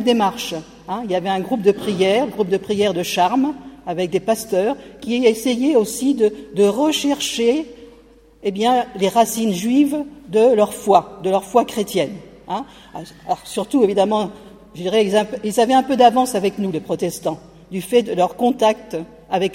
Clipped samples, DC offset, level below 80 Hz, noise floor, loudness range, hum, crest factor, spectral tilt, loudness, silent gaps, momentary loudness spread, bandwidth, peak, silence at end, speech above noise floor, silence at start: under 0.1%; under 0.1%; -54 dBFS; -48 dBFS; 3 LU; none; 18 dB; -4.5 dB/octave; -18 LUFS; none; 12 LU; 16.5 kHz; 0 dBFS; 0 s; 30 dB; 0 s